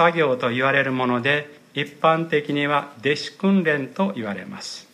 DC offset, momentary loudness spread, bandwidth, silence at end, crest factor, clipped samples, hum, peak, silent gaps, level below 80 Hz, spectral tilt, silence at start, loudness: under 0.1%; 11 LU; 11.5 kHz; 0.1 s; 18 dB; under 0.1%; none; -4 dBFS; none; -70 dBFS; -6 dB/octave; 0 s; -22 LUFS